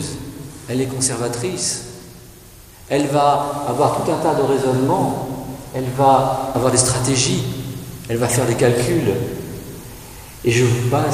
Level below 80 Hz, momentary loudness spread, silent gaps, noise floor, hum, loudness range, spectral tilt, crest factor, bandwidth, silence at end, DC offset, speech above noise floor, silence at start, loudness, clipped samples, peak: -44 dBFS; 16 LU; none; -42 dBFS; none; 3 LU; -4.5 dB/octave; 18 dB; 16 kHz; 0 s; under 0.1%; 24 dB; 0 s; -18 LUFS; under 0.1%; 0 dBFS